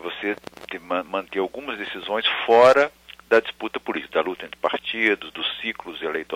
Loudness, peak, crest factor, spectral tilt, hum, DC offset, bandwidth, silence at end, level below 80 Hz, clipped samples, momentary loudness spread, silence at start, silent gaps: -22 LUFS; -4 dBFS; 18 dB; -4 dB/octave; none; under 0.1%; 15.5 kHz; 0 s; -62 dBFS; under 0.1%; 15 LU; 0 s; none